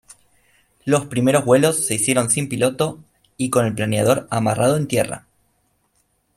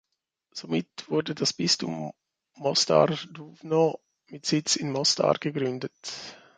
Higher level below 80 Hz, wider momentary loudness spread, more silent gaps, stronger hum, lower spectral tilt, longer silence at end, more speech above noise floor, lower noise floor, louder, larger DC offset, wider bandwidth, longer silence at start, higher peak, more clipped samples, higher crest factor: first, -56 dBFS vs -70 dBFS; second, 9 LU vs 17 LU; neither; neither; about the same, -4.5 dB/octave vs -3.5 dB/octave; first, 1.2 s vs 0.25 s; about the same, 47 dB vs 49 dB; second, -65 dBFS vs -76 dBFS; first, -19 LUFS vs -26 LUFS; neither; first, 15.5 kHz vs 9.6 kHz; first, 0.85 s vs 0.55 s; first, -2 dBFS vs -6 dBFS; neither; about the same, 18 dB vs 22 dB